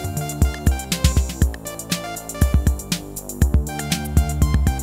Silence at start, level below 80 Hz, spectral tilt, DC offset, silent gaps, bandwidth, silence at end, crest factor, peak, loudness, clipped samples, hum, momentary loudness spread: 0 s; -22 dBFS; -5 dB/octave; under 0.1%; none; 16.5 kHz; 0 s; 18 dB; -2 dBFS; -22 LUFS; under 0.1%; none; 7 LU